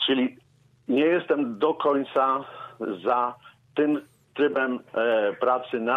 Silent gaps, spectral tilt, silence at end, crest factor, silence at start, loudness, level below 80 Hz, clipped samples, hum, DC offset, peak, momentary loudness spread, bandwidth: none; -6.5 dB/octave; 0 s; 16 dB; 0 s; -25 LUFS; -74 dBFS; under 0.1%; none; under 0.1%; -10 dBFS; 10 LU; 5.2 kHz